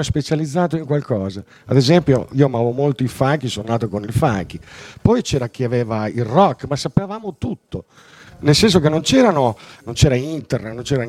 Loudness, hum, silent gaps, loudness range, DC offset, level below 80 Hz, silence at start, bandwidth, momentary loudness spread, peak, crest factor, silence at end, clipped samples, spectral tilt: -18 LUFS; none; none; 3 LU; under 0.1%; -40 dBFS; 0 s; 14.5 kHz; 14 LU; 0 dBFS; 18 dB; 0 s; under 0.1%; -6 dB/octave